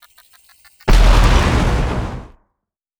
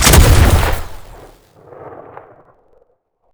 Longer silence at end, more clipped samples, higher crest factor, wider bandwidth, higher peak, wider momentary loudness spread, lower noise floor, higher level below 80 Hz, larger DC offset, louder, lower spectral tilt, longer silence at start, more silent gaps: second, 0.75 s vs 1.45 s; second, under 0.1% vs 0.3%; about the same, 16 dB vs 14 dB; second, 12 kHz vs over 20 kHz; about the same, 0 dBFS vs 0 dBFS; second, 14 LU vs 27 LU; first, -76 dBFS vs -58 dBFS; about the same, -16 dBFS vs -18 dBFS; neither; second, -16 LUFS vs -11 LUFS; first, -5.5 dB/octave vs -4 dB/octave; first, 0.85 s vs 0 s; neither